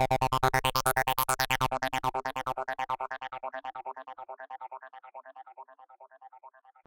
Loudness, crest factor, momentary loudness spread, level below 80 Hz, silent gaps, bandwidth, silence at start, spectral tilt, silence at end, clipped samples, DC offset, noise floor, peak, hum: -30 LUFS; 22 dB; 22 LU; -52 dBFS; none; 17 kHz; 0 s; -3 dB/octave; 0.4 s; under 0.1%; under 0.1%; -56 dBFS; -10 dBFS; none